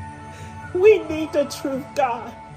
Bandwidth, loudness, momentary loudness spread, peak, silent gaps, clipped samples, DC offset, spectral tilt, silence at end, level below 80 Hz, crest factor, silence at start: 15 kHz; -21 LUFS; 21 LU; -4 dBFS; none; under 0.1%; under 0.1%; -5.5 dB/octave; 0 s; -52 dBFS; 18 dB; 0 s